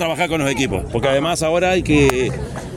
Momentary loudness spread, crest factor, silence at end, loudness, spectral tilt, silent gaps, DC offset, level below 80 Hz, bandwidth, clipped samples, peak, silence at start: 6 LU; 18 dB; 0 s; -17 LUFS; -5 dB/octave; none; under 0.1%; -34 dBFS; 16.5 kHz; under 0.1%; 0 dBFS; 0 s